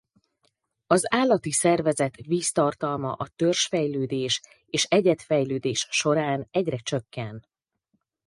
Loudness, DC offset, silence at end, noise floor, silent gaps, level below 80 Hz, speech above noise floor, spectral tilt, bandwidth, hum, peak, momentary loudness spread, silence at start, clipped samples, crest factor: -24 LUFS; under 0.1%; 0.85 s; -75 dBFS; none; -64 dBFS; 51 dB; -4 dB/octave; 11.5 kHz; none; -4 dBFS; 9 LU; 0.9 s; under 0.1%; 20 dB